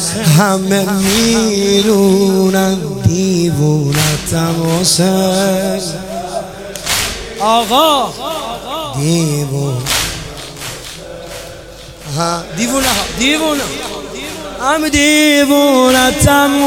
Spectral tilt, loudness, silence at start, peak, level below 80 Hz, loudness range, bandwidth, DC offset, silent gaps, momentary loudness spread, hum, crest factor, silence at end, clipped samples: -4 dB/octave; -12 LUFS; 0 s; 0 dBFS; -34 dBFS; 7 LU; 18 kHz; under 0.1%; none; 15 LU; none; 14 dB; 0 s; under 0.1%